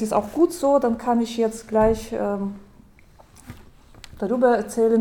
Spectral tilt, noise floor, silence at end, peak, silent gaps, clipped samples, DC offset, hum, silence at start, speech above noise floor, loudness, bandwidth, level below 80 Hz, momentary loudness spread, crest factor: -6 dB/octave; -51 dBFS; 0 s; -6 dBFS; none; under 0.1%; under 0.1%; none; 0 s; 30 dB; -22 LUFS; 18 kHz; -44 dBFS; 9 LU; 16 dB